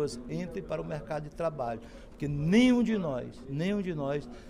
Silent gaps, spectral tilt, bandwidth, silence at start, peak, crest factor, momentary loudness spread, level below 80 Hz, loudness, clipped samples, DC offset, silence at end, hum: none; -6.5 dB/octave; 11 kHz; 0 s; -10 dBFS; 20 dB; 14 LU; -50 dBFS; -31 LUFS; under 0.1%; under 0.1%; 0 s; none